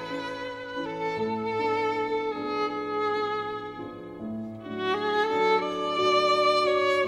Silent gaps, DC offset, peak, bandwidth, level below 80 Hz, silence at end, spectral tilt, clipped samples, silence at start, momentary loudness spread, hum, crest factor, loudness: none; under 0.1%; -12 dBFS; 12.5 kHz; -64 dBFS; 0 s; -4.5 dB/octave; under 0.1%; 0 s; 14 LU; none; 16 dB; -27 LUFS